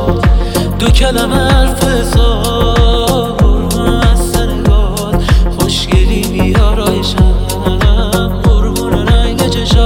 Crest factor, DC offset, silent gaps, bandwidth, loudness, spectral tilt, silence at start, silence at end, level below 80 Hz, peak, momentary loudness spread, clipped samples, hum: 10 dB; under 0.1%; none; 17 kHz; -12 LUFS; -5.5 dB/octave; 0 s; 0 s; -12 dBFS; 0 dBFS; 3 LU; under 0.1%; none